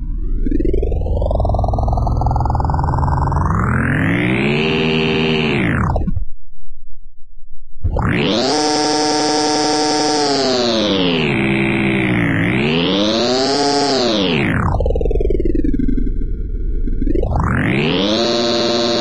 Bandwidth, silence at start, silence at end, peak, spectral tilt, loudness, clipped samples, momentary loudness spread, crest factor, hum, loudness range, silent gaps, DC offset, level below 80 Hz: 11 kHz; 0 s; 0 s; -6 dBFS; -5 dB/octave; -16 LUFS; under 0.1%; 6 LU; 10 dB; none; 4 LU; none; 1%; -22 dBFS